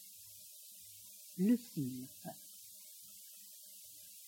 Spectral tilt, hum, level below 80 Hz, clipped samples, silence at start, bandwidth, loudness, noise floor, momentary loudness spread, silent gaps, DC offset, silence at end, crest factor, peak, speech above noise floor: -5.5 dB/octave; none; -86 dBFS; under 0.1%; 0 s; 17 kHz; -43 LUFS; -56 dBFS; 18 LU; none; under 0.1%; 0 s; 20 dB; -22 dBFS; 19 dB